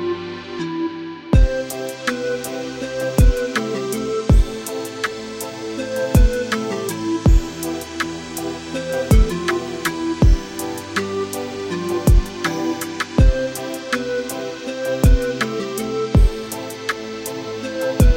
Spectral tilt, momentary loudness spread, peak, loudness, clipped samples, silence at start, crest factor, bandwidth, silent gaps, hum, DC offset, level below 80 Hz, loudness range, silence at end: -5.5 dB/octave; 10 LU; -2 dBFS; -21 LUFS; under 0.1%; 0 s; 18 dB; 17 kHz; none; none; under 0.1%; -22 dBFS; 0 LU; 0 s